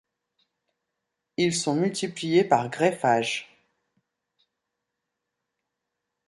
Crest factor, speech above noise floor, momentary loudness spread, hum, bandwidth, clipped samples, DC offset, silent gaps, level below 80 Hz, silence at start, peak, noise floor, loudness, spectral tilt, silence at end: 22 dB; 60 dB; 9 LU; none; 11.5 kHz; under 0.1%; under 0.1%; none; -72 dBFS; 1.4 s; -8 dBFS; -83 dBFS; -24 LUFS; -4.5 dB/octave; 2.85 s